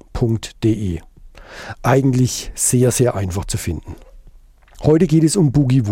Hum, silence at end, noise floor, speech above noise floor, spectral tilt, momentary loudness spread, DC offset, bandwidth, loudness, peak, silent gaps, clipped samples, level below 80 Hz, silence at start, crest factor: none; 0 s; -45 dBFS; 29 dB; -6 dB/octave; 14 LU; under 0.1%; 16.5 kHz; -17 LUFS; -4 dBFS; none; under 0.1%; -36 dBFS; 0.15 s; 14 dB